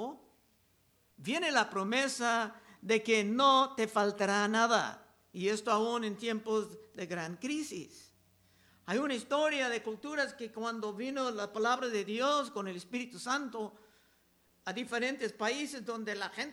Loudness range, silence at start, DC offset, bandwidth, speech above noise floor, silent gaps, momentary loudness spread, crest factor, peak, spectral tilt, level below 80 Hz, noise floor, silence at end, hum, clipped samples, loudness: 8 LU; 0 s; under 0.1%; 17 kHz; 37 dB; none; 13 LU; 20 dB; -14 dBFS; -3.5 dB/octave; -80 dBFS; -71 dBFS; 0 s; none; under 0.1%; -33 LUFS